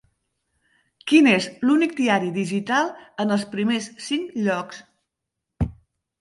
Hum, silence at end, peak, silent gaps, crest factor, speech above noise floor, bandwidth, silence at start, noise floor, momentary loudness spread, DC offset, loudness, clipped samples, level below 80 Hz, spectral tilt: none; 0.5 s; -4 dBFS; none; 20 dB; 61 dB; 11.5 kHz; 1.05 s; -83 dBFS; 13 LU; under 0.1%; -22 LUFS; under 0.1%; -46 dBFS; -5 dB/octave